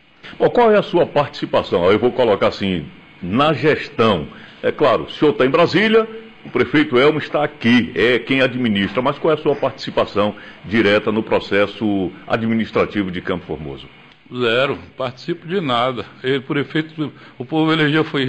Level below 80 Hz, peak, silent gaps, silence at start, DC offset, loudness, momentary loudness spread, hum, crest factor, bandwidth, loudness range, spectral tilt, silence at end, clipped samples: -50 dBFS; -4 dBFS; none; 0.25 s; 0.2%; -18 LUFS; 12 LU; none; 14 dB; 8.6 kHz; 5 LU; -7 dB/octave; 0 s; under 0.1%